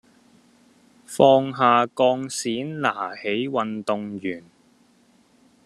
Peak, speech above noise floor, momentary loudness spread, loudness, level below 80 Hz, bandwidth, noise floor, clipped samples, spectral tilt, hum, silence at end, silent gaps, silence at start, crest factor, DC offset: -2 dBFS; 37 dB; 14 LU; -22 LUFS; -70 dBFS; 13 kHz; -59 dBFS; under 0.1%; -4.5 dB/octave; none; 1.25 s; none; 1.1 s; 22 dB; under 0.1%